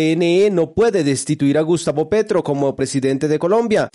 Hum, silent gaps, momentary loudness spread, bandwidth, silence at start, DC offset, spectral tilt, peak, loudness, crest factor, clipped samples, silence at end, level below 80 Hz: none; none; 4 LU; 11.5 kHz; 0 s; under 0.1%; -5.5 dB/octave; -6 dBFS; -17 LUFS; 10 dB; under 0.1%; 0.05 s; -50 dBFS